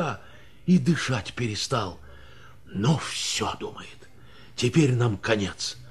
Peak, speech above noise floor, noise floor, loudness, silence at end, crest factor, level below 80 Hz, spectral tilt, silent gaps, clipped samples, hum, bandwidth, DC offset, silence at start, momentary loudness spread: -8 dBFS; 26 dB; -51 dBFS; -26 LUFS; 0 s; 20 dB; -52 dBFS; -5 dB/octave; none; under 0.1%; none; 13 kHz; 0.4%; 0 s; 17 LU